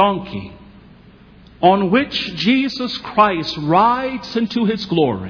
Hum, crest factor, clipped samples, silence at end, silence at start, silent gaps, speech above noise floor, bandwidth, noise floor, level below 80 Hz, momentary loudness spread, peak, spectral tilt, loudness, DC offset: none; 18 dB; under 0.1%; 0 s; 0 s; none; 28 dB; 5.4 kHz; -45 dBFS; -48 dBFS; 9 LU; 0 dBFS; -6.5 dB/octave; -17 LUFS; under 0.1%